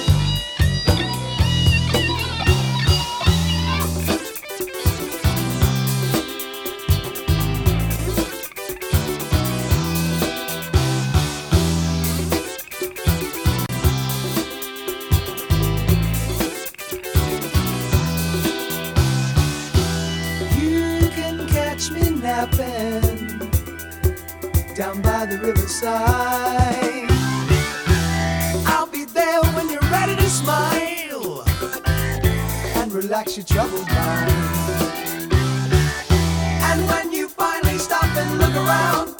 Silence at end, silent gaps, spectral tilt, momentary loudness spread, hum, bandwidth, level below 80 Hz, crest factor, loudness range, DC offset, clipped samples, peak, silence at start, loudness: 0 s; none; -5 dB/octave; 6 LU; none; over 20 kHz; -30 dBFS; 18 dB; 3 LU; under 0.1%; under 0.1%; -2 dBFS; 0 s; -20 LUFS